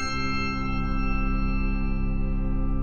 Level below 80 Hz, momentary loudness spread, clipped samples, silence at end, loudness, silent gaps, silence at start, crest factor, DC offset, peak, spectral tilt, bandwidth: -26 dBFS; 2 LU; under 0.1%; 0 s; -28 LUFS; none; 0 s; 10 dB; under 0.1%; -14 dBFS; -6 dB/octave; 7 kHz